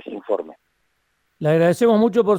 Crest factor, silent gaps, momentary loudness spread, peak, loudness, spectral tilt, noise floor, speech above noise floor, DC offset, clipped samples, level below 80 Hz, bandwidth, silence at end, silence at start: 14 dB; none; 10 LU; -4 dBFS; -19 LUFS; -7 dB/octave; -69 dBFS; 52 dB; under 0.1%; under 0.1%; -64 dBFS; 16 kHz; 0 s; 0.05 s